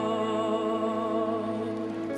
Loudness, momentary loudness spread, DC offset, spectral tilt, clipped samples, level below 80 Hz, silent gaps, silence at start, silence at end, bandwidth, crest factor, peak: -29 LUFS; 4 LU; under 0.1%; -6.5 dB/octave; under 0.1%; -66 dBFS; none; 0 s; 0 s; 11.5 kHz; 12 dB; -16 dBFS